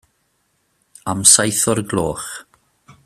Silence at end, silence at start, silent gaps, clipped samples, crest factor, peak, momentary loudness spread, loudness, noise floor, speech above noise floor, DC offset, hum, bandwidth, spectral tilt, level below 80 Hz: 0.65 s; 1.05 s; none; under 0.1%; 20 dB; 0 dBFS; 20 LU; -14 LUFS; -66 dBFS; 49 dB; under 0.1%; none; 16 kHz; -2.5 dB/octave; -50 dBFS